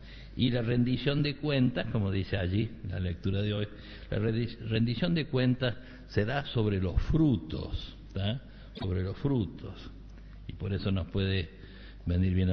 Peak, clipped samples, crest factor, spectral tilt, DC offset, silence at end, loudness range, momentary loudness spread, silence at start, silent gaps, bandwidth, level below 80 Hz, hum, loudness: -12 dBFS; under 0.1%; 18 dB; -6.5 dB/octave; under 0.1%; 0 s; 5 LU; 16 LU; 0 s; none; 6 kHz; -44 dBFS; none; -31 LUFS